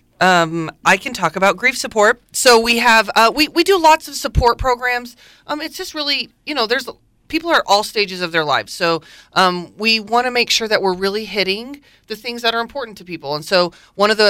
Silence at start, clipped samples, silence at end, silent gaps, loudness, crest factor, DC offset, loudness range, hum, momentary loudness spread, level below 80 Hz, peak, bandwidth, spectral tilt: 0.2 s; under 0.1%; 0 s; none; -16 LUFS; 14 dB; under 0.1%; 7 LU; none; 13 LU; -38 dBFS; -2 dBFS; 17 kHz; -3 dB/octave